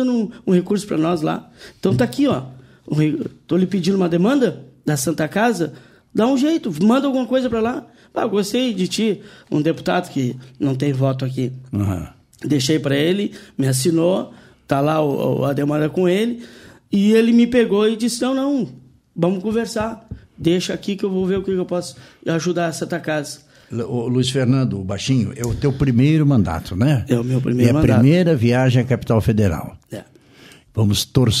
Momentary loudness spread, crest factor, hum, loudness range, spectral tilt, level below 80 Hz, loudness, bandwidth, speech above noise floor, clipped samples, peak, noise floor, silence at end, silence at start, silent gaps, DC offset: 11 LU; 18 dB; none; 5 LU; -6.5 dB/octave; -44 dBFS; -19 LUFS; 15.5 kHz; 28 dB; under 0.1%; 0 dBFS; -46 dBFS; 0 s; 0 s; none; under 0.1%